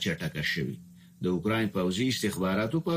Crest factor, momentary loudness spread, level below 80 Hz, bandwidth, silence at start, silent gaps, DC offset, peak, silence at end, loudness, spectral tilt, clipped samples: 14 dB; 6 LU; -58 dBFS; 15.5 kHz; 0 s; none; under 0.1%; -16 dBFS; 0 s; -29 LUFS; -5 dB/octave; under 0.1%